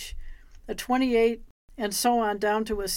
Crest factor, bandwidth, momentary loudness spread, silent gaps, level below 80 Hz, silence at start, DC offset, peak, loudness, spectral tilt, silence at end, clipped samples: 16 dB; 17 kHz; 14 LU; 1.51-1.68 s; -44 dBFS; 0 s; under 0.1%; -12 dBFS; -25 LUFS; -3 dB/octave; 0 s; under 0.1%